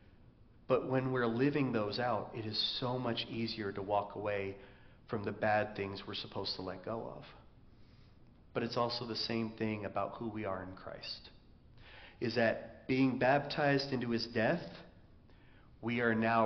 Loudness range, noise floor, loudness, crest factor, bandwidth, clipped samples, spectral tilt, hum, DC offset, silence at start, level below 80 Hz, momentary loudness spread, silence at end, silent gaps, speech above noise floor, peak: 6 LU; -61 dBFS; -36 LUFS; 20 dB; 6.4 kHz; under 0.1%; -4 dB/octave; none; under 0.1%; 0.4 s; -64 dBFS; 13 LU; 0 s; none; 25 dB; -18 dBFS